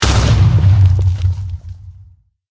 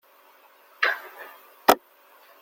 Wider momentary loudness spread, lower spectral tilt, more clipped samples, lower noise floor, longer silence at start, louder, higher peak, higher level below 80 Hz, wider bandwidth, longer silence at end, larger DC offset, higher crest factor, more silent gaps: second, 17 LU vs 22 LU; first, -5.5 dB/octave vs -2 dB/octave; neither; second, -45 dBFS vs -56 dBFS; second, 0 s vs 0.8 s; first, -13 LUFS vs -24 LUFS; about the same, 0 dBFS vs 0 dBFS; first, -20 dBFS vs -66 dBFS; second, 8 kHz vs 17 kHz; about the same, 0.6 s vs 0.65 s; neither; second, 12 dB vs 28 dB; neither